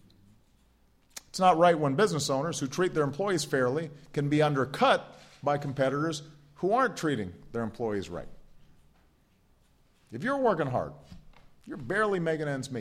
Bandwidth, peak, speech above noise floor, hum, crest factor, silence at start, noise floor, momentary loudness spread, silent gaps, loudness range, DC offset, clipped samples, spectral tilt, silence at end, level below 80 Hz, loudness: 15.5 kHz; -10 dBFS; 37 dB; none; 20 dB; 1.15 s; -65 dBFS; 15 LU; none; 7 LU; under 0.1%; under 0.1%; -5.5 dB/octave; 0 s; -60 dBFS; -28 LUFS